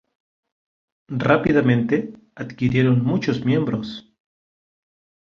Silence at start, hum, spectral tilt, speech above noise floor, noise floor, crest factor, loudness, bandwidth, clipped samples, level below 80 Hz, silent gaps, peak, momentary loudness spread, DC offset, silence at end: 1.1 s; none; -8 dB/octave; over 70 dB; under -90 dBFS; 20 dB; -20 LUFS; 7 kHz; under 0.1%; -52 dBFS; none; -2 dBFS; 18 LU; under 0.1%; 1.3 s